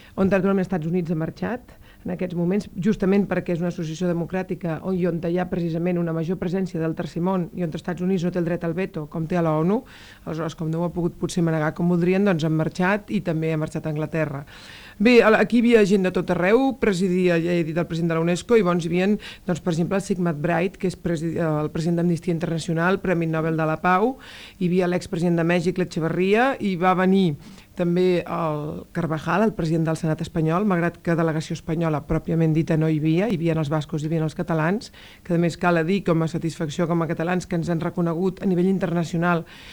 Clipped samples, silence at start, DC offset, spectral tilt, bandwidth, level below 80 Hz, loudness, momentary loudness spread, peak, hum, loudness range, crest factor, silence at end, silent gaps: under 0.1%; 0.15 s; under 0.1%; -7 dB/octave; 19.5 kHz; -48 dBFS; -23 LUFS; 8 LU; -4 dBFS; none; 5 LU; 18 dB; 0 s; none